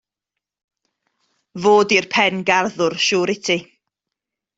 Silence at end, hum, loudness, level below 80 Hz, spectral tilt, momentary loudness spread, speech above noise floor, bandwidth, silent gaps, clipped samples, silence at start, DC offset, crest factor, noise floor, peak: 0.95 s; none; -17 LUFS; -64 dBFS; -3.5 dB/octave; 7 LU; 67 dB; 8 kHz; none; under 0.1%; 1.55 s; under 0.1%; 20 dB; -84 dBFS; 0 dBFS